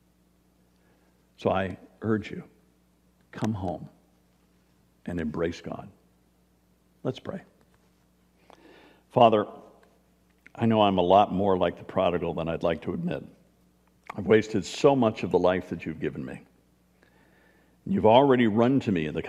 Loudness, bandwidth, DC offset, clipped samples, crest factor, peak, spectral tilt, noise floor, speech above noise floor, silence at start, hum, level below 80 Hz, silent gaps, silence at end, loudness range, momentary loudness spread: -25 LUFS; 11 kHz; under 0.1%; under 0.1%; 22 dB; -4 dBFS; -7 dB/octave; -65 dBFS; 40 dB; 1.4 s; none; -58 dBFS; none; 0 s; 12 LU; 20 LU